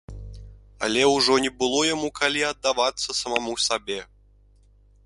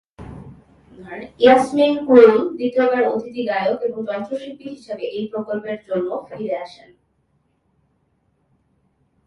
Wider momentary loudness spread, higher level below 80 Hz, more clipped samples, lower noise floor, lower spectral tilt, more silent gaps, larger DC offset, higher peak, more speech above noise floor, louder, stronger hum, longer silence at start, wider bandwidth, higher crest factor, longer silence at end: second, 14 LU vs 22 LU; first, -48 dBFS vs -56 dBFS; neither; second, -56 dBFS vs -65 dBFS; second, -2 dB/octave vs -6 dB/octave; neither; neither; second, -4 dBFS vs 0 dBFS; second, 33 dB vs 47 dB; second, -23 LUFS vs -18 LUFS; first, 50 Hz at -55 dBFS vs none; about the same, 0.1 s vs 0.2 s; about the same, 11.5 kHz vs 11 kHz; about the same, 22 dB vs 20 dB; second, 1 s vs 2.6 s